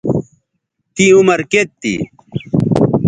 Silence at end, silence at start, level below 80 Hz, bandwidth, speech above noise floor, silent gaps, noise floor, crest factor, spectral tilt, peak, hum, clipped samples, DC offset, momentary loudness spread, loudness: 0 s; 0.05 s; -44 dBFS; 9.4 kHz; 58 dB; none; -70 dBFS; 14 dB; -5.5 dB/octave; 0 dBFS; none; under 0.1%; under 0.1%; 15 LU; -13 LUFS